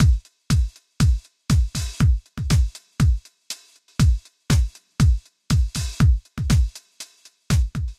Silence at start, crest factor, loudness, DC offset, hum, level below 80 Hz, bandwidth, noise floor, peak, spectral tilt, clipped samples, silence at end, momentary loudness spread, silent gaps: 0 s; 16 dB; -22 LUFS; under 0.1%; none; -24 dBFS; 15 kHz; -44 dBFS; -4 dBFS; -5.5 dB/octave; under 0.1%; 0.05 s; 14 LU; none